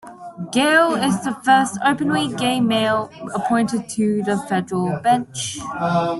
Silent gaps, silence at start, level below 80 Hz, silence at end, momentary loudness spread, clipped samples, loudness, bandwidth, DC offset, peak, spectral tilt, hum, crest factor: none; 0.05 s; -58 dBFS; 0 s; 10 LU; under 0.1%; -19 LUFS; 12 kHz; under 0.1%; -2 dBFS; -4.5 dB/octave; none; 16 dB